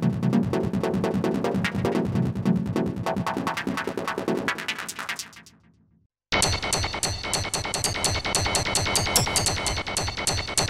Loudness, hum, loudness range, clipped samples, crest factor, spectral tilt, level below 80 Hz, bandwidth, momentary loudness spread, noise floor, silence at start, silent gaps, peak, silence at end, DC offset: -25 LUFS; none; 5 LU; under 0.1%; 20 dB; -3.5 dB/octave; -42 dBFS; 16 kHz; 7 LU; -59 dBFS; 0 s; 6.06-6.10 s; -6 dBFS; 0 s; under 0.1%